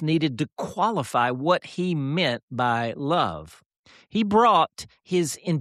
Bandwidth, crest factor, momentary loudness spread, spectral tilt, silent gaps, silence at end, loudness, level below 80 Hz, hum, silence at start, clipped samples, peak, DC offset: 13.5 kHz; 16 dB; 10 LU; -5.5 dB/octave; 2.43-2.48 s, 3.66-3.70 s, 3.76-3.84 s; 0 s; -24 LUFS; -60 dBFS; none; 0 s; under 0.1%; -8 dBFS; under 0.1%